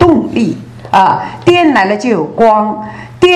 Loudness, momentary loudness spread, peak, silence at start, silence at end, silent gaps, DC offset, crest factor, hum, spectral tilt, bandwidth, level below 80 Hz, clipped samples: -10 LUFS; 10 LU; 0 dBFS; 0 s; 0 s; none; under 0.1%; 10 dB; none; -6 dB/octave; 10 kHz; -38 dBFS; 1%